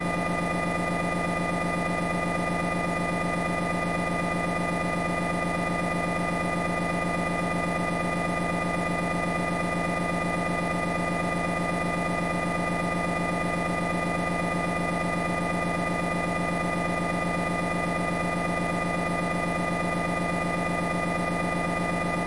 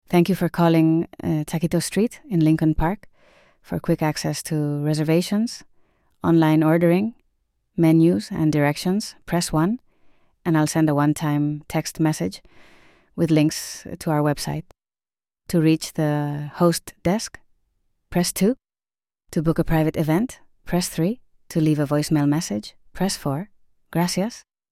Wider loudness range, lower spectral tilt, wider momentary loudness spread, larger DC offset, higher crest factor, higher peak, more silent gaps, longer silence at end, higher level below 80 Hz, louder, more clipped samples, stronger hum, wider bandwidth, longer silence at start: second, 0 LU vs 4 LU; about the same, -6 dB/octave vs -6 dB/octave; second, 0 LU vs 11 LU; first, 0.1% vs under 0.1%; second, 10 dB vs 18 dB; second, -16 dBFS vs -4 dBFS; neither; second, 0 s vs 0.3 s; about the same, -46 dBFS vs -44 dBFS; second, -27 LUFS vs -22 LUFS; neither; first, 60 Hz at -70 dBFS vs none; second, 11.5 kHz vs 15.5 kHz; about the same, 0 s vs 0.1 s